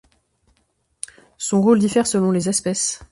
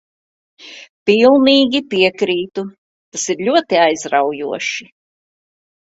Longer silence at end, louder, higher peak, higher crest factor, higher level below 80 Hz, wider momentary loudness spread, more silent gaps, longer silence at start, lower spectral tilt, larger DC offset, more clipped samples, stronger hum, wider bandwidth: second, 0.1 s vs 1 s; second, -18 LUFS vs -15 LUFS; second, -4 dBFS vs 0 dBFS; about the same, 16 dB vs 16 dB; first, -56 dBFS vs -62 dBFS; first, 19 LU vs 16 LU; second, none vs 0.89-1.06 s, 2.78-3.12 s; first, 1.4 s vs 0.6 s; first, -5 dB/octave vs -3.5 dB/octave; neither; neither; neither; first, 11.5 kHz vs 8 kHz